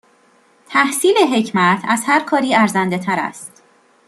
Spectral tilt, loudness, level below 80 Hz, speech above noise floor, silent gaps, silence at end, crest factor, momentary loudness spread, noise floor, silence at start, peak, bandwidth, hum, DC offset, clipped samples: -4 dB/octave; -16 LUFS; -64 dBFS; 38 dB; none; 0.6 s; 16 dB; 7 LU; -54 dBFS; 0.7 s; -2 dBFS; 13 kHz; none; under 0.1%; under 0.1%